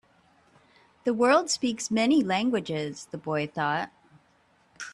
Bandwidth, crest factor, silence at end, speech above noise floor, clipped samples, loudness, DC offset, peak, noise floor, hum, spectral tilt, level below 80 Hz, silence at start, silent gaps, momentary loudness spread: 11.5 kHz; 18 dB; 0 s; 38 dB; under 0.1%; -26 LUFS; under 0.1%; -10 dBFS; -64 dBFS; none; -4 dB/octave; -70 dBFS; 1.05 s; none; 13 LU